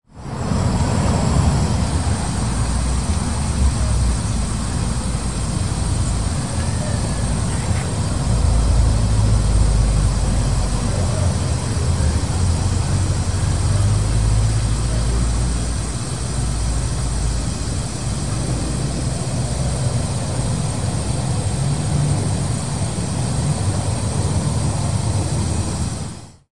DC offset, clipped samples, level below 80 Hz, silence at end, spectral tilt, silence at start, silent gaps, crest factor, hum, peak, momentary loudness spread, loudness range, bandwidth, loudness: 2%; under 0.1%; -24 dBFS; 0 s; -5.5 dB/octave; 0 s; none; 16 dB; none; -4 dBFS; 5 LU; 4 LU; 11.5 kHz; -20 LUFS